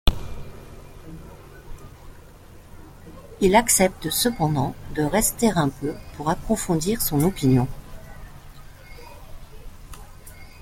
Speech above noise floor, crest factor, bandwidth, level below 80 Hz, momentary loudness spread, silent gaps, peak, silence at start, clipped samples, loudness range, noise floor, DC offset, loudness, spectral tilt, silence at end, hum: 24 dB; 22 dB; 16.5 kHz; -36 dBFS; 26 LU; none; -2 dBFS; 0.05 s; under 0.1%; 7 LU; -45 dBFS; under 0.1%; -22 LUFS; -4.5 dB/octave; 0 s; none